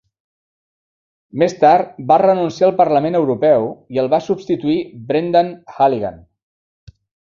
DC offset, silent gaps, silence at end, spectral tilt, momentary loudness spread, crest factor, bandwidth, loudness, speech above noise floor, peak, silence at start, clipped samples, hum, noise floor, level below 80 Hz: under 0.1%; none; 1.2 s; -7 dB/octave; 9 LU; 16 dB; 7.4 kHz; -16 LUFS; over 75 dB; 0 dBFS; 1.35 s; under 0.1%; none; under -90 dBFS; -56 dBFS